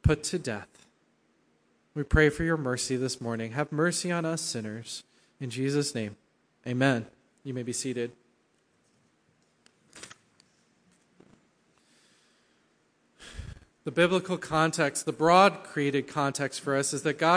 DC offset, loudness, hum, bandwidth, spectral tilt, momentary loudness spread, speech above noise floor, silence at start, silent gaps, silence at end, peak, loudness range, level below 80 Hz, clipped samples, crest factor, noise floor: under 0.1%; -28 LUFS; none; 10.5 kHz; -4.5 dB/octave; 19 LU; 42 dB; 0.05 s; none; 0 s; -6 dBFS; 13 LU; -46 dBFS; under 0.1%; 24 dB; -70 dBFS